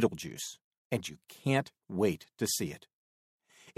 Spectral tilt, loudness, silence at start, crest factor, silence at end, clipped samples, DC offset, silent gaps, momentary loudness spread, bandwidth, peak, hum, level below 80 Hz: -4.5 dB/octave; -34 LUFS; 0 s; 22 dB; 0.1 s; under 0.1%; under 0.1%; 0.64-0.71 s, 0.77-0.90 s, 2.93-3.40 s; 11 LU; 16 kHz; -12 dBFS; none; -68 dBFS